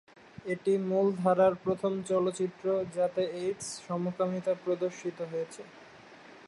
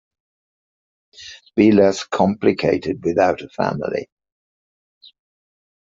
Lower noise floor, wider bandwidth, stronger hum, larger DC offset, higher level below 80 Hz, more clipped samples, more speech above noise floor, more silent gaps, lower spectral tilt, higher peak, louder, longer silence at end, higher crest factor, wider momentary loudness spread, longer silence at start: second, -52 dBFS vs under -90 dBFS; first, 11.5 kHz vs 7.8 kHz; neither; neither; second, -72 dBFS vs -58 dBFS; neither; second, 22 dB vs over 73 dB; neither; about the same, -6 dB/octave vs -6.5 dB/octave; second, -14 dBFS vs -2 dBFS; second, -31 LUFS vs -18 LUFS; second, 0 s vs 1.8 s; about the same, 18 dB vs 18 dB; second, 11 LU vs 14 LU; second, 0.45 s vs 1.2 s